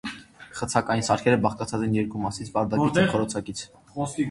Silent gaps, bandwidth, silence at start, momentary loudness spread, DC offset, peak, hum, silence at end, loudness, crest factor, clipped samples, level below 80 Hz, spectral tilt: none; 11.5 kHz; 0.05 s; 15 LU; under 0.1%; -4 dBFS; none; 0 s; -25 LUFS; 22 dB; under 0.1%; -52 dBFS; -5.5 dB/octave